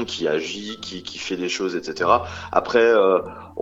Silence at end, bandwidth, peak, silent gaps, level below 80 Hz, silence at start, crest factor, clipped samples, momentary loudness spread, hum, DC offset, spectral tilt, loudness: 0 s; 8 kHz; 0 dBFS; none; -54 dBFS; 0 s; 22 dB; under 0.1%; 15 LU; none; under 0.1%; -4 dB/octave; -21 LUFS